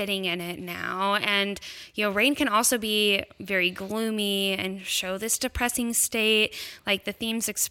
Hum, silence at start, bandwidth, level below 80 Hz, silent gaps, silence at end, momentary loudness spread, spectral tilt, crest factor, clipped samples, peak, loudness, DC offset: none; 0 s; 17 kHz; -50 dBFS; none; 0 s; 8 LU; -2 dB/octave; 18 dB; under 0.1%; -8 dBFS; -25 LUFS; under 0.1%